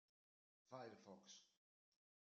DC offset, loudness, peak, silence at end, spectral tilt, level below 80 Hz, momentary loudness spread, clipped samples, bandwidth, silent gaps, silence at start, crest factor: under 0.1%; -62 LUFS; -42 dBFS; 0.85 s; -3.5 dB/octave; under -90 dBFS; 6 LU; under 0.1%; 7.4 kHz; none; 0.65 s; 24 dB